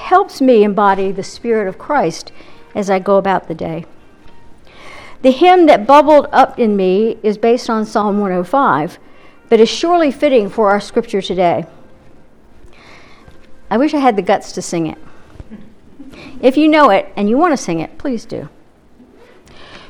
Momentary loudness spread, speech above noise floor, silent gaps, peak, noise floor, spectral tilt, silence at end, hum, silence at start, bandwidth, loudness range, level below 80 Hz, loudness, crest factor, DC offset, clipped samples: 14 LU; 32 dB; none; 0 dBFS; -44 dBFS; -5.5 dB/octave; 0.1 s; none; 0 s; 13.5 kHz; 8 LU; -46 dBFS; -13 LUFS; 14 dB; under 0.1%; under 0.1%